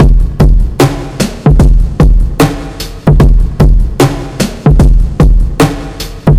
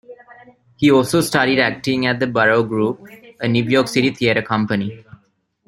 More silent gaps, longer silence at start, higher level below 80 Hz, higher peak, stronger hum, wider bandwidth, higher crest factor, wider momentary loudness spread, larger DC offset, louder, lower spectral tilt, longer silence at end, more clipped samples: neither; about the same, 0 s vs 0.1 s; first, -8 dBFS vs -54 dBFS; about the same, 0 dBFS vs -2 dBFS; neither; about the same, 15 kHz vs 16 kHz; second, 6 dB vs 16 dB; about the same, 7 LU vs 8 LU; neither; first, -10 LUFS vs -17 LUFS; about the same, -6.5 dB/octave vs -5.5 dB/octave; second, 0 s vs 0.65 s; first, 0.2% vs under 0.1%